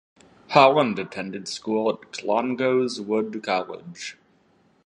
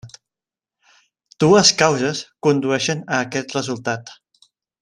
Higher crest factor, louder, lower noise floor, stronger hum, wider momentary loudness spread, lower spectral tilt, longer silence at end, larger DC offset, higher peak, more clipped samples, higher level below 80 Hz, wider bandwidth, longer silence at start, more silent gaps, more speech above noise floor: about the same, 24 dB vs 20 dB; second, -23 LUFS vs -18 LUFS; second, -61 dBFS vs -90 dBFS; neither; first, 18 LU vs 13 LU; first, -5 dB/octave vs -3.5 dB/octave; about the same, 0.75 s vs 0.7 s; neither; about the same, 0 dBFS vs 0 dBFS; neither; second, -70 dBFS vs -60 dBFS; about the same, 11 kHz vs 12 kHz; first, 0.5 s vs 0.05 s; neither; second, 38 dB vs 71 dB